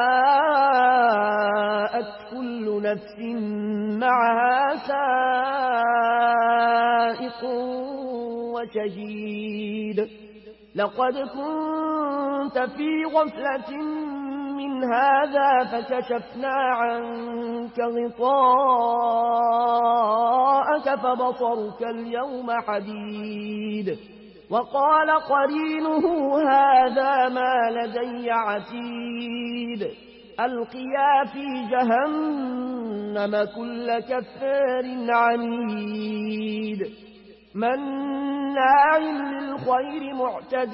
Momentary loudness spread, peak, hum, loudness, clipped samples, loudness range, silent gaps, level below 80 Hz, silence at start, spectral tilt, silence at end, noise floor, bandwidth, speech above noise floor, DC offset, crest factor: 12 LU; -8 dBFS; none; -23 LUFS; under 0.1%; 7 LU; none; -64 dBFS; 0 s; -9.5 dB/octave; 0 s; -46 dBFS; 5.8 kHz; 23 dB; under 0.1%; 16 dB